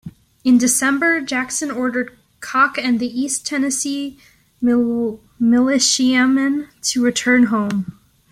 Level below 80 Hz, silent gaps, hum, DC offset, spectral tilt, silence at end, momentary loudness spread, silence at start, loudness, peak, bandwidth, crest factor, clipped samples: -58 dBFS; none; none; under 0.1%; -2.5 dB/octave; 0.4 s; 10 LU; 0.05 s; -17 LUFS; -2 dBFS; 15 kHz; 16 dB; under 0.1%